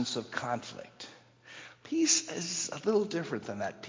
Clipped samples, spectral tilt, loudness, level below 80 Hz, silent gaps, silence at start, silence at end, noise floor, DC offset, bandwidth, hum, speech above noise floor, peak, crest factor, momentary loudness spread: under 0.1%; -2.5 dB/octave; -31 LUFS; -74 dBFS; none; 0 s; 0 s; -53 dBFS; under 0.1%; 7.8 kHz; none; 20 dB; -14 dBFS; 20 dB; 22 LU